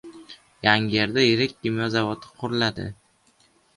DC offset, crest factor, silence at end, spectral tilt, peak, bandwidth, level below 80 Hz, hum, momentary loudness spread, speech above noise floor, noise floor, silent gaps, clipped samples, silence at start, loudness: under 0.1%; 24 dB; 0.85 s; -5.5 dB/octave; 0 dBFS; 11.5 kHz; -56 dBFS; none; 14 LU; 39 dB; -61 dBFS; none; under 0.1%; 0.05 s; -23 LUFS